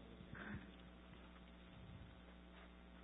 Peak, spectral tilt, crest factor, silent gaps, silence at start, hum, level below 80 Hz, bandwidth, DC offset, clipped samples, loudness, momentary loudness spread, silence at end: -40 dBFS; -4 dB/octave; 18 dB; none; 0 s; none; -64 dBFS; 3.9 kHz; under 0.1%; under 0.1%; -58 LUFS; 9 LU; 0 s